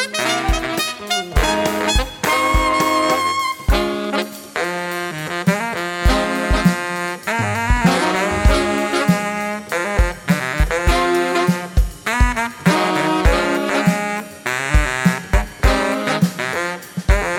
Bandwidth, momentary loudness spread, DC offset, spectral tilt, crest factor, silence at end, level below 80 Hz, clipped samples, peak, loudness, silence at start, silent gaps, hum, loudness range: 17.5 kHz; 6 LU; under 0.1%; -4.5 dB/octave; 16 dB; 0 s; -24 dBFS; under 0.1%; -2 dBFS; -18 LUFS; 0 s; none; none; 2 LU